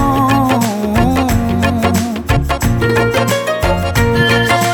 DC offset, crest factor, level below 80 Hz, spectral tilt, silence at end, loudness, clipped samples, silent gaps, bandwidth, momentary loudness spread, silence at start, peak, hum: under 0.1%; 12 dB; -24 dBFS; -5.5 dB/octave; 0 s; -13 LUFS; under 0.1%; none; over 20 kHz; 4 LU; 0 s; 0 dBFS; none